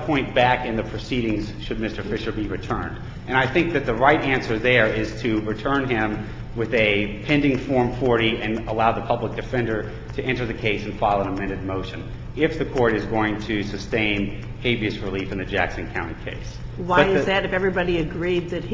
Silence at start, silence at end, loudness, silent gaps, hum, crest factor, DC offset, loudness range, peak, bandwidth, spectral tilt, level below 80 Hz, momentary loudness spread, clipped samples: 0 s; 0 s; -23 LUFS; none; none; 22 dB; under 0.1%; 4 LU; -2 dBFS; 7.6 kHz; -6.5 dB/octave; -38 dBFS; 10 LU; under 0.1%